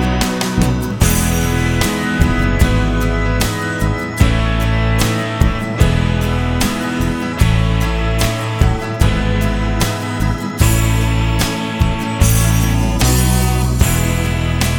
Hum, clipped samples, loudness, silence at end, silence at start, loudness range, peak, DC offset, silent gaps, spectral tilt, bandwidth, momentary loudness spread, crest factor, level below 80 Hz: none; under 0.1%; -16 LUFS; 0 s; 0 s; 2 LU; 0 dBFS; under 0.1%; none; -5 dB/octave; 19 kHz; 4 LU; 14 dB; -20 dBFS